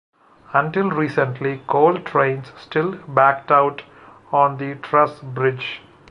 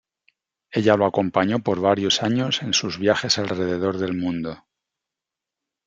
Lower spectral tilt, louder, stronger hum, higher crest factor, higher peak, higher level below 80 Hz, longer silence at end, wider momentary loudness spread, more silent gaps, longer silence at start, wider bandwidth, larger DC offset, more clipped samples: first, -8 dB/octave vs -4.5 dB/octave; about the same, -19 LUFS vs -21 LUFS; neither; about the same, 18 dB vs 20 dB; about the same, -2 dBFS vs -2 dBFS; about the same, -64 dBFS vs -62 dBFS; second, 0.35 s vs 1.3 s; first, 11 LU vs 7 LU; neither; second, 0.5 s vs 0.7 s; about the same, 10 kHz vs 9.2 kHz; neither; neither